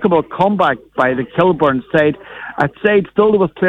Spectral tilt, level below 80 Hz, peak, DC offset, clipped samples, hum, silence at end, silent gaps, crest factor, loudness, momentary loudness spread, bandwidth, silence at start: -8 dB/octave; -48 dBFS; -2 dBFS; under 0.1%; under 0.1%; none; 0 s; none; 14 dB; -15 LUFS; 6 LU; 7 kHz; 0 s